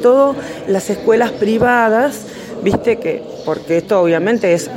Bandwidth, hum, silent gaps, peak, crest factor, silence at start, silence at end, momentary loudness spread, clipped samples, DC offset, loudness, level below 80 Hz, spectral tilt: 16.5 kHz; none; none; -2 dBFS; 14 dB; 0 s; 0 s; 10 LU; under 0.1%; under 0.1%; -15 LUFS; -48 dBFS; -5.5 dB/octave